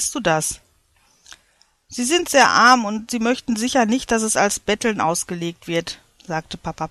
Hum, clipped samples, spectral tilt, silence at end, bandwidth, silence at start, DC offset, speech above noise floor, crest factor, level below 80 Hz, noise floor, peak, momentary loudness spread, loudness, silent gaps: none; under 0.1%; -3 dB/octave; 0 s; 14 kHz; 0 s; under 0.1%; 41 dB; 20 dB; -50 dBFS; -60 dBFS; -2 dBFS; 15 LU; -19 LUFS; none